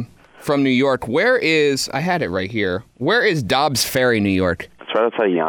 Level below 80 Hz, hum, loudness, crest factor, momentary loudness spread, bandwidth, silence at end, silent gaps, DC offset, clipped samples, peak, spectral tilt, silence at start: -50 dBFS; none; -18 LUFS; 14 dB; 8 LU; 19 kHz; 0 s; none; under 0.1%; under 0.1%; -4 dBFS; -4.5 dB/octave; 0 s